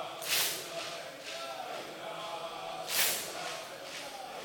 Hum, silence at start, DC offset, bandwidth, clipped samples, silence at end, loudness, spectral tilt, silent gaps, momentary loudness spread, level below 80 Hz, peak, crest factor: none; 0 s; under 0.1%; over 20 kHz; under 0.1%; 0 s; -35 LUFS; 0 dB/octave; none; 13 LU; -76 dBFS; -10 dBFS; 28 dB